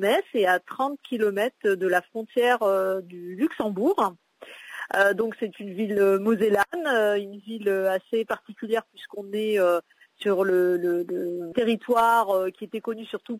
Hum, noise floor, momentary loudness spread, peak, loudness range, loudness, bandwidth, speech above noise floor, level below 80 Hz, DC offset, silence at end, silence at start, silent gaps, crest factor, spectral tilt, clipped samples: none; -45 dBFS; 11 LU; -10 dBFS; 2 LU; -25 LUFS; 16 kHz; 21 dB; -70 dBFS; under 0.1%; 0 s; 0 s; none; 16 dB; -5 dB/octave; under 0.1%